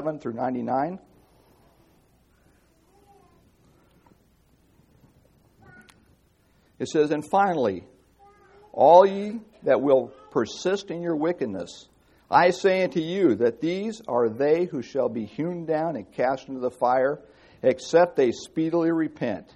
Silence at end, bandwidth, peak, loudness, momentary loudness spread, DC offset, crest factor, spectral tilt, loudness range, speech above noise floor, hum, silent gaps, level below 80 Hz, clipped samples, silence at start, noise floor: 0.15 s; 11.5 kHz; -2 dBFS; -24 LUFS; 11 LU; under 0.1%; 24 dB; -6 dB/octave; 9 LU; 39 dB; none; none; -66 dBFS; under 0.1%; 0 s; -62 dBFS